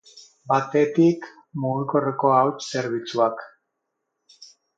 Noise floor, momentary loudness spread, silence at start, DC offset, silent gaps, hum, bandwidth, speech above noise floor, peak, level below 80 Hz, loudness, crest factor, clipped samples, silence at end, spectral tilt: -79 dBFS; 11 LU; 0.15 s; under 0.1%; none; none; 7.8 kHz; 57 dB; -6 dBFS; -74 dBFS; -22 LUFS; 18 dB; under 0.1%; 0.35 s; -6.5 dB/octave